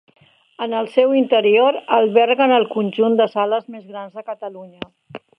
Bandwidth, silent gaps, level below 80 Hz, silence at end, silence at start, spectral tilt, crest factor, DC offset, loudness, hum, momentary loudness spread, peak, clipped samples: 5.6 kHz; none; -68 dBFS; 0.2 s; 0.6 s; -7 dB/octave; 18 dB; under 0.1%; -16 LUFS; none; 19 LU; 0 dBFS; under 0.1%